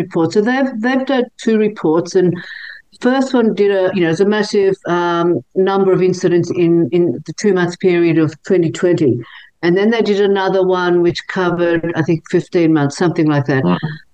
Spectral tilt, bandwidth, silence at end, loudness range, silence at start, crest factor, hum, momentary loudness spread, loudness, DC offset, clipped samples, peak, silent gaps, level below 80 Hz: -6.5 dB/octave; 8.8 kHz; 0.15 s; 1 LU; 0 s; 12 dB; none; 4 LU; -15 LUFS; 0.2%; under 0.1%; -2 dBFS; none; -56 dBFS